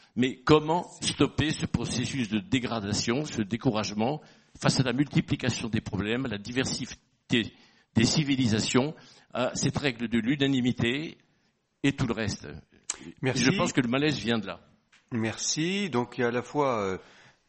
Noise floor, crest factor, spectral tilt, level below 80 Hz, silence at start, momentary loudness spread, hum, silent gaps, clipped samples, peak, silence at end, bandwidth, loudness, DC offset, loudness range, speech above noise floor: -72 dBFS; 24 dB; -4.5 dB/octave; -54 dBFS; 0.15 s; 12 LU; none; none; under 0.1%; -4 dBFS; 0.45 s; 8.8 kHz; -28 LUFS; under 0.1%; 2 LU; 44 dB